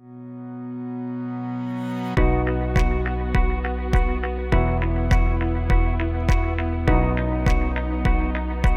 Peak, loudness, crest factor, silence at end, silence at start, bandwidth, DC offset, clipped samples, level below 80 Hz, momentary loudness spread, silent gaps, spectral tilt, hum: -4 dBFS; -23 LUFS; 18 dB; 0 s; 0.05 s; 7.6 kHz; under 0.1%; under 0.1%; -22 dBFS; 9 LU; none; -7.5 dB/octave; none